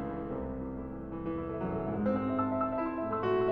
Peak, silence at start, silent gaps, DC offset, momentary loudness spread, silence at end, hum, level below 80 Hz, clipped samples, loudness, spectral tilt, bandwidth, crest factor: -18 dBFS; 0 s; none; under 0.1%; 8 LU; 0 s; none; -50 dBFS; under 0.1%; -34 LUFS; -10 dB/octave; 5.2 kHz; 14 dB